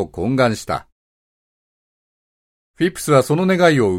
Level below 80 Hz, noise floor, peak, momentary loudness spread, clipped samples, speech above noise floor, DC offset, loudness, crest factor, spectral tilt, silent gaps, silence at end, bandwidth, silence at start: -50 dBFS; under -90 dBFS; 0 dBFS; 11 LU; under 0.1%; over 74 dB; under 0.1%; -17 LUFS; 18 dB; -6 dB/octave; 0.92-2.74 s; 0 s; 16.5 kHz; 0 s